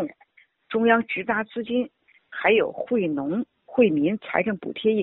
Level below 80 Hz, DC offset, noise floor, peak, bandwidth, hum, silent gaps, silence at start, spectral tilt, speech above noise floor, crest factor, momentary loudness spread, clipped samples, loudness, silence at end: -64 dBFS; under 0.1%; -59 dBFS; -4 dBFS; 4.1 kHz; none; none; 0 s; -4 dB/octave; 36 dB; 20 dB; 9 LU; under 0.1%; -24 LUFS; 0 s